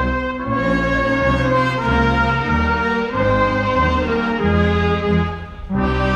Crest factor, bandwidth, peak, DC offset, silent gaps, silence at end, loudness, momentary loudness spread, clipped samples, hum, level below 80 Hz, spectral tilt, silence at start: 14 dB; 9.2 kHz; -4 dBFS; under 0.1%; none; 0 s; -18 LUFS; 5 LU; under 0.1%; none; -28 dBFS; -7.5 dB/octave; 0 s